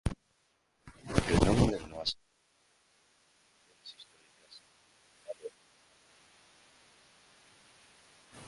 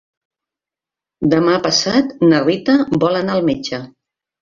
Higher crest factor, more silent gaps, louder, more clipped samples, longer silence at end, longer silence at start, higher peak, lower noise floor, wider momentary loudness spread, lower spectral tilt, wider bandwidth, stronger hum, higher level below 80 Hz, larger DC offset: first, 30 dB vs 16 dB; neither; second, -31 LUFS vs -15 LUFS; neither; second, 0 s vs 0.55 s; second, 0.05 s vs 1.2 s; second, -8 dBFS vs -2 dBFS; second, -74 dBFS vs -88 dBFS; first, 28 LU vs 8 LU; about the same, -5.5 dB/octave vs -5 dB/octave; first, 11.5 kHz vs 7.6 kHz; neither; first, -46 dBFS vs -52 dBFS; neither